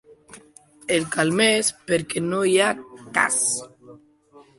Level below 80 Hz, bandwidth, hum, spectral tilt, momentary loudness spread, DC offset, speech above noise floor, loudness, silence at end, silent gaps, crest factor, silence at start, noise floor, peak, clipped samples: -62 dBFS; 12 kHz; none; -2.5 dB/octave; 8 LU; under 0.1%; 31 dB; -21 LUFS; 0.2 s; none; 20 dB; 0.35 s; -52 dBFS; -4 dBFS; under 0.1%